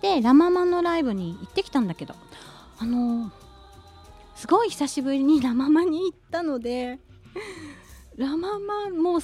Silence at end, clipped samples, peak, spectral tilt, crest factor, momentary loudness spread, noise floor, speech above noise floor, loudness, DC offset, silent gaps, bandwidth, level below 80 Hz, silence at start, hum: 0 s; under 0.1%; -6 dBFS; -5.5 dB/octave; 18 dB; 20 LU; -48 dBFS; 25 dB; -24 LUFS; under 0.1%; none; 13.5 kHz; -54 dBFS; 0.05 s; none